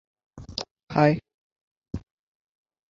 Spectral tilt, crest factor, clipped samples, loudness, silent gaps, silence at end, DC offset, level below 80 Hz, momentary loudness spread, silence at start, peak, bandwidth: -7 dB/octave; 24 dB; under 0.1%; -25 LUFS; 0.71-0.76 s, 0.83-0.87 s, 1.34-1.82 s; 0.9 s; under 0.1%; -52 dBFS; 18 LU; 0.35 s; -6 dBFS; 7.6 kHz